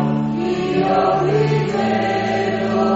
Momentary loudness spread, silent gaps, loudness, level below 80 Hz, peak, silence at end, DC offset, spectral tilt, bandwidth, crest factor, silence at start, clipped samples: 4 LU; none; -18 LUFS; -46 dBFS; -4 dBFS; 0 s; under 0.1%; -5.5 dB/octave; 8 kHz; 14 dB; 0 s; under 0.1%